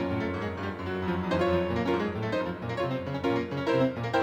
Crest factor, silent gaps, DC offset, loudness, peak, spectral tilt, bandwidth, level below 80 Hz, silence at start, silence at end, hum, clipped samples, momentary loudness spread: 16 dB; none; under 0.1%; -29 LUFS; -12 dBFS; -7.5 dB/octave; 16 kHz; -52 dBFS; 0 s; 0 s; none; under 0.1%; 6 LU